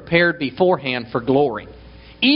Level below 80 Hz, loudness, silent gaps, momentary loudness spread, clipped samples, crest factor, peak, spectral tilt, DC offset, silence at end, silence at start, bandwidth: -48 dBFS; -19 LUFS; none; 6 LU; under 0.1%; 18 dB; 0 dBFS; -3 dB/octave; under 0.1%; 0 s; 0 s; 5.6 kHz